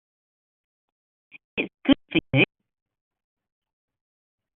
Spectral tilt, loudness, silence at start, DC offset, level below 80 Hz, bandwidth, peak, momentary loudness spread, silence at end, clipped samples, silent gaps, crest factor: -4 dB/octave; -24 LUFS; 1.55 s; under 0.1%; -56 dBFS; 4 kHz; -4 dBFS; 9 LU; 2.1 s; under 0.1%; none; 26 dB